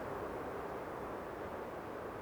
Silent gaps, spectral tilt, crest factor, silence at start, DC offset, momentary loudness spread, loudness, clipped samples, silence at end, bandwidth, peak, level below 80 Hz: none; -6.5 dB/octave; 12 dB; 0 s; under 0.1%; 2 LU; -44 LUFS; under 0.1%; 0 s; over 20 kHz; -30 dBFS; -62 dBFS